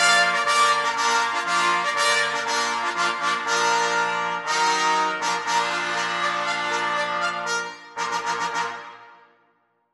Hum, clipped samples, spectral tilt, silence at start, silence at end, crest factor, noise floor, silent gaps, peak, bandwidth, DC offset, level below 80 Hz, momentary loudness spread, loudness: none; under 0.1%; -0.5 dB/octave; 0 s; 0.8 s; 18 dB; -66 dBFS; none; -6 dBFS; 11.5 kHz; under 0.1%; -76 dBFS; 8 LU; -22 LUFS